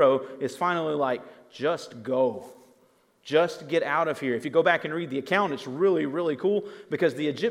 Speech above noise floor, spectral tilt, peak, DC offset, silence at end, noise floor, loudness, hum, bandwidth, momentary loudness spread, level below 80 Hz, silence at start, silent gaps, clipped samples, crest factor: 37 dB; -5.5 dB/octave; -6 dBFS; under 0.1%; 0 s; -63 dBFS; -26 LUFS; none; 14 kHz; 8 LU; -82 dBFS; 0 s; none; under 0.1%; 20 dB